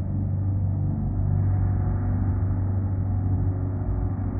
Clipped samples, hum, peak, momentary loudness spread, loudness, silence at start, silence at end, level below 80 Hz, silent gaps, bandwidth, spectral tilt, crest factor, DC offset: under 0.1%; none; -14 dBFS; 4 LU; -26 LUFS; 0 s; 0 s; -32 dBFS; none; 2.2 kHz; -15 dB/octave; 10 dB; under 0.1%